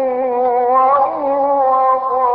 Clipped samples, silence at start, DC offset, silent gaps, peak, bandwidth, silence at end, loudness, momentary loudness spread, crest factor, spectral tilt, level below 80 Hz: under 0.1%; 0 s; under 0.1%; none; -4 dBFS; 4.9 kHz; 0 s; -14 LUFS; 4 LU; 10 dB; -10 dB/octave; -58 dBFS